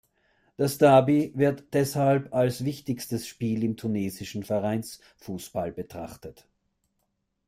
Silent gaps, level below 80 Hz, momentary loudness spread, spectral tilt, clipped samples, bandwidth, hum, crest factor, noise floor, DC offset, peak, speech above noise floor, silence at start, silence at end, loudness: none; -62 dBFS; 19 LU; -6.5 dB/octave; under 0.1%; 16 kHz; none; 20 dB; -77 dBFS; under 0.1%; -8 dBFS; 51 dB; 0.6 s; 1.15 s; -26 LUFS